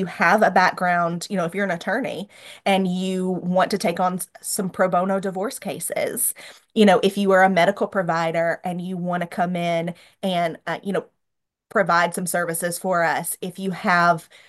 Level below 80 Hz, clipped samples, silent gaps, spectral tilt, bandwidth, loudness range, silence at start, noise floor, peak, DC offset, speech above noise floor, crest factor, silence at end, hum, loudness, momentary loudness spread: -70 dBFS; under 0.1%; none; -4.5 dB/octave; 13 kHz; 4 LU; 0 s; -80 dBFS; -4 dBFS; under 0.1%; 59 dB; 18 dB; 0.25 s; none; -21 LUFS; 11 LU